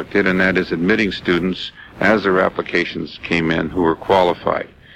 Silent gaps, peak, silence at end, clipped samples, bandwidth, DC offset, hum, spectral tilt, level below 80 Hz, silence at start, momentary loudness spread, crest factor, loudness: none; -2 dBFS; 0.3 s; under 0.1%; 11 kHz; under 0.1%; none; -6.5 dB/octave; -44 dBFS; 0 s; 9 LU; 16 dB; -18 LUFS